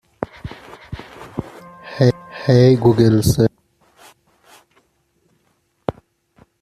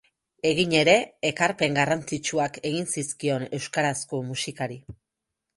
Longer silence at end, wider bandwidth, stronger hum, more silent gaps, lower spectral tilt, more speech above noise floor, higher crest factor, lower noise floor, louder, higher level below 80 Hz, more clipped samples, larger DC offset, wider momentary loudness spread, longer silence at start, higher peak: about the same, 0.7 s vs 0.65 s; first, 14.5 kHz vs 11.5 kHz; neither; neither; first, -7 dB/octave vs -4 dB/octave; second, 52 dB vs 59 dB; about the same, 18 dB vs 22 dB; second, -64 dBFS vs -84 dBFS; first, -16 LUFS vs -25 LUFS; first, -44 dBFS vs -60 dBFS; neither; neither; first, 23 LU vs 10 LU; second, 0.2 s vs 0.45 s; about the same, -2 dBFS vs -4 dBFS